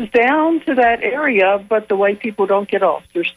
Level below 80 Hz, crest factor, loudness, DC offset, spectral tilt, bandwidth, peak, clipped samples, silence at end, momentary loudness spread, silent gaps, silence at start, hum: -54 dBFS; 12 dB; -16 LUFS; under 0.1%; -6.5 dB/octave; 11.5 kHz; -4 dBFS; under 0.1%; 0.05 s; 4 LU; none; 0 s; none